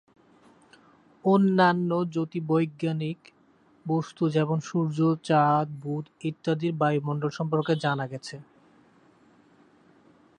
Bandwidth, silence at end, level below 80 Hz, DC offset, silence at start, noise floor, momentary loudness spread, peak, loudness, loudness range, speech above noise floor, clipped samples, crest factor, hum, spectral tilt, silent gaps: 9.6 kHz; 1.95 s; -72 dBFS; under 0.1%; 1.25 s; -61 dBFS; 13 LU; -8 dBFS; -26 LUFS; 4 LU; 35 dB; under 0.1%; 20 dB; none; -7.5 dB/octave; none